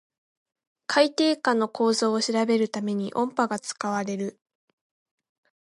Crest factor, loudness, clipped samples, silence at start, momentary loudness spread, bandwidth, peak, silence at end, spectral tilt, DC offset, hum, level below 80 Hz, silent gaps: 20 dB; -25 LUFS; under 0.1%; 0.9 s; 8 LU; 11.5 kHz; -6 dBFS; 1.35 s; -4 dB/octave; under 0.1%; none; -78 dBFS; none